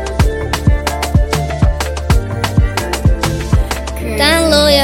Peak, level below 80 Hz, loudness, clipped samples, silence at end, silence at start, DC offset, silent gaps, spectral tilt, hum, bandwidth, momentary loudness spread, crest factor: 0 dBFS; -18 dBFS; -14 LUFS; under 0.1%; 0 s; 0 s; under 0.1%; none; -5 dB/octave; none; 17 kHz; 7 LU; 12 dB